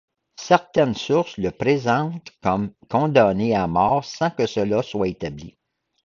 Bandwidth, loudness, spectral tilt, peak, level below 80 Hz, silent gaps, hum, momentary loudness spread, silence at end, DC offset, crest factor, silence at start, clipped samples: 7.6 kHz; -21 LUFS; -6.5 dB/octave; -2 dBFS; -50 dBFS; none; none; 9 LU; 0.55 s; under 0.1%; 20 dB; 0.4 s; under 0.1%